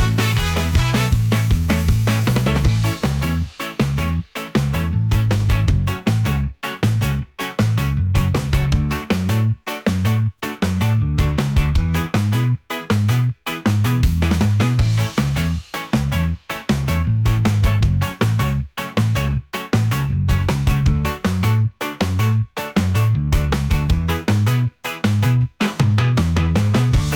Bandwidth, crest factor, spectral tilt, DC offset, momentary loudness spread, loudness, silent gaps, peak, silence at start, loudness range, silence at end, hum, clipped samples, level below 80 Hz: 19.5 kHz; 12 dB; -6.5 dB/octave; under 0.1%; 5 LU; -19 LUFS; none; -6 dBFS; 0 s; 1 LU; 0 s; none; under 0.1%; -26 dBFS